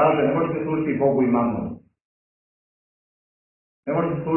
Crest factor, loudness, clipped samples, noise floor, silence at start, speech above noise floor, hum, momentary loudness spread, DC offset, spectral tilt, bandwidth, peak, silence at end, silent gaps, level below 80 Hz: 18 dB; -22 LUFS; under 0.1%; under -90 dBFS; 0 s; over 69 dB; none; 14 LU; under 0.1%; -12 dB/octave; 3.1 kHz; -6 dBFS; 0 s; 2.01-3.83 s; -56 dBFS